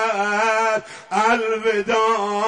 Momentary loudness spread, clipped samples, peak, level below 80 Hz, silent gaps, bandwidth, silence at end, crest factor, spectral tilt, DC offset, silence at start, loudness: 4 LU; under 0.1%; -6 dBFS; -62 dBFS; none; 11 kHz; 0 s; 14 dB; -3 dB/octave; under 0.1%; 0 s; -19 LUFS